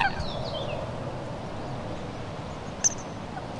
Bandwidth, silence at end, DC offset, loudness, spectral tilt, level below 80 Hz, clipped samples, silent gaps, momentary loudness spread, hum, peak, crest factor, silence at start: 12 kHz; 0 s; under 0.1%; -32 LUFS; -3 dB/octave; -46 dBFS; under 0.1%; none; 11 LU; none; -8 dBFS; 24 dB; 0 s